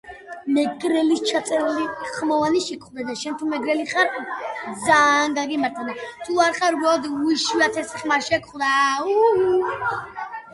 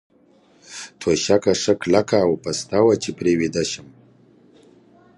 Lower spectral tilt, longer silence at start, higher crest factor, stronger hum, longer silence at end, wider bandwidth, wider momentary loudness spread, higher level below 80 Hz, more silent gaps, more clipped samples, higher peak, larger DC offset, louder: second, -3 dB/octave vs -4.5 dB/octave; second, 0.05 s vs 0.7 s; about the same, 20 dB vs 20 dB; neither; second, 0 s vs 1.35 s; about the same, 11.5 kHz vs 11.5 kHz; about the same, 12 LU vs 13 LU; second, -62 dBFS vs -52 dBFS; neither; neither; about the same, -2 dBFS vs -2 dBFS; neither; about the same, -21 LUFS vs -20 LUFS